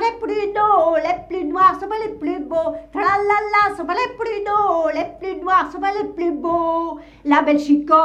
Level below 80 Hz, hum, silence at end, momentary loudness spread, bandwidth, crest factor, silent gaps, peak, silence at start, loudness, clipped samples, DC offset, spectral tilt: -50 dBFS; none; 0 s; 9 LU; 9.4 kHz; 16 dB; none; -2 dBFS; 0 s; -19 LUFS; under 0.1%; under 0.1%; -5.5 dB/octave